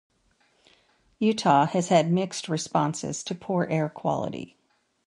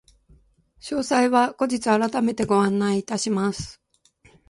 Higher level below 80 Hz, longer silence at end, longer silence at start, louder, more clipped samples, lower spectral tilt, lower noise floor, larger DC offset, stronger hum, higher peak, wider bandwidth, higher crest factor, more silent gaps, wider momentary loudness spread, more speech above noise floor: second, -66 dBFS vs -56 dBFS; second, 0.6 s vs 0.75 s; first, 1.2 s vs 0.85 s; second, -25 LUFS vs -22 LUFS; neither; about the same, -5.5 dB/octave vs -5 dB/octave; first, -66 dBFS vs -58 dBFS; neither; neither; about the same, -6 dBFS vs -6 dBFS; about the same, 11.5 kHz vs 11.5 kHz; about the same, 20 dB vs 18 dB; neither; about the same, 11 LU vs 10 LU; first, 42 dB vs 37 dB